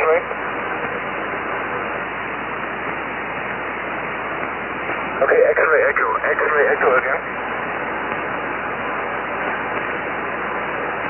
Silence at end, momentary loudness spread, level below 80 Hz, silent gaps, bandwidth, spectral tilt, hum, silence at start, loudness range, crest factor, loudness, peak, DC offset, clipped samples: 0 s; 9 LU; -50 dBFS; none; 3.2 kHz; -8 dB/octave; none; 0 s; 7 LU; 18 dB; -21 LUFS; -4 dBFS; under 0.1%; under 0.1%